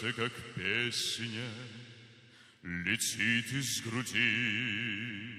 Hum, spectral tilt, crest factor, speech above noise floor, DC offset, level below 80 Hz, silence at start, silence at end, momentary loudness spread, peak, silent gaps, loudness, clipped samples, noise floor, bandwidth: none; -2.5 dB/octave; 20 dB; 24 dB; under 0.1%; -70 dBFS; 0 s; 0 s; 15 LU; -14 dBFS; none; -32 LUFS; under 0.1%; -59 dBFS; 15 kHz